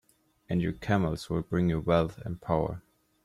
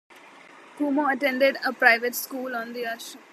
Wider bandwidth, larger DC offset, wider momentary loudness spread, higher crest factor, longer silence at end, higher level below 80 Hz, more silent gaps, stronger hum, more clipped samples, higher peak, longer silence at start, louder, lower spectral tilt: second, 12.5 kHz vs 14.5 kHz; neither; second, 8 LU vs 13 LU; second, 18 dB vs 24 dB; first, 0.45 s vs 0.15 s; first, -50 dBFS vs under -90 dBFS; neither; neither; neither; second, -12 dBFS vs -2 dBFS; first, 0.5 s vs 0.15 s; second, -30 LUFS vs -24 LUFS; first, -8 dB/octave vs -2 dB/octave